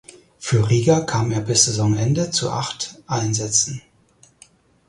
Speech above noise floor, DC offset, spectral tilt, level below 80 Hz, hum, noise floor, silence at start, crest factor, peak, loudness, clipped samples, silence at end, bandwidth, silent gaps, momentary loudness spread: 36 dB; under 0.1%; -4 dB/octave; -50 dBFS; none; -55 dBFS; 0.4 s; 20 dB; 0 dBFS; -19 LUFS; under 0.1%; 1.1 s; 11.5 kHz; none; 10 LU